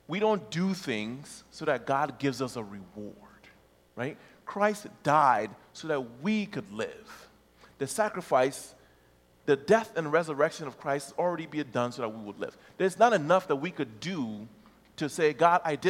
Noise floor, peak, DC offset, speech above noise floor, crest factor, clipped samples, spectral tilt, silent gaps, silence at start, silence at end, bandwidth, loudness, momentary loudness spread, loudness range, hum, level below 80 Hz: -62 dBFS; -8 dBFS; under 0.1%; 33 dB; 22 dB; under 0.1%; -5 dB/octave; none; 0.1 s; 0 s; 16.5 kHz; -29 LUFS; 19 LU; 5 LU; none; -70 dBFS